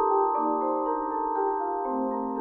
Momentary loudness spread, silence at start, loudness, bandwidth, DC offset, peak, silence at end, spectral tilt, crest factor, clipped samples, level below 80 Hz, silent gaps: 5 LU; 0 s; -27 LUFS; 2.5 kHz; under 0.1%; -12 dBFS; 0 s; -10 dB/octave; 14 dB; under 0.1%; -60 dBFS; none